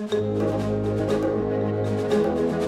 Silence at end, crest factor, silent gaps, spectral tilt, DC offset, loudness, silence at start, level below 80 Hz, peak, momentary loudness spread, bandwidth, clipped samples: 0 s; 14 dB; none; -7.5 dB/octave; under 0.1%; -24 LUFS; 0 s; -46 dBFS; -10 dBFS; 3 LU; 13 kHz; under 0.1%